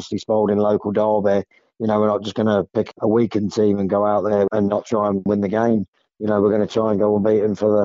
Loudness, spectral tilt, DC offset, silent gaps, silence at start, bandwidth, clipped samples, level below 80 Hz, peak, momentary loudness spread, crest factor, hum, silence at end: -19 LUFS; -7 dB/octave; under 0.1%; 5.88-5.93 s; 0 s; 7.6 kHz; under 0.1%; -58 dBFS; -6 dBFS; 4 LU; 12 dB; none; 0 s